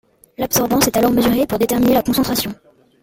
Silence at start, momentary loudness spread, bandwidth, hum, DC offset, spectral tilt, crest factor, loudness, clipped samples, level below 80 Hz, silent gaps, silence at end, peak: 0.4 s; 6 LU; 17 kHz; none; under 0.1%; -4 dB/octave; 16 dB; -16 LUFS; under 0.1%; -42 dBFS; none; 0.5 s; 0 dBFS